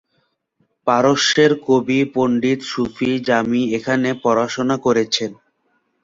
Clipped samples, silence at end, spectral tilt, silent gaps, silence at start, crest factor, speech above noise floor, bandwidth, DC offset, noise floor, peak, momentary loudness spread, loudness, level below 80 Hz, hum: under 0.1%; 0.7 s; -4.5 dB/octave; none; 0.85 s; 16 dB; 50 dB; 7.8 kHz; under 0.1%; -67 dBFS; -2 dBFS; 7 LU; -17 LUFS; -56 dBFS; none